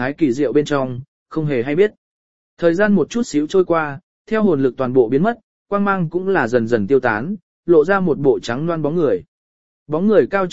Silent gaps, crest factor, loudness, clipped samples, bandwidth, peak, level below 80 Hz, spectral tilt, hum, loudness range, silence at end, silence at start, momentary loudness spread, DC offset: 1.08-1.26 s, 1.97-2.57 s, 4.03-4.25 s, 5.43-5.66 s, 7.42-7.63 s, 9.28-9.86 s; 16 dB; -18 LUFS; under 0.1%; 8 kHz; 0 dBFS; -52 dBFS; -7 dB/octave; none; 1 LU; 0 s; 0 s; 9 LU; 1%